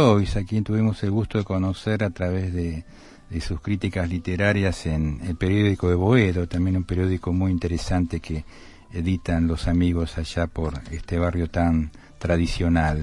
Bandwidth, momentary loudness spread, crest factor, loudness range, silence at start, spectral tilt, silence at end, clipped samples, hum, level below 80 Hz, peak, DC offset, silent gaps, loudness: 11.5 kHz; 9 LU; 18 dB; 4 LU; 0 s; -7.5 dB/octave; 0 s; under 0.1%; none; -36 dBFS; -4 dBFS; under 0.1%; none; -24 LUFS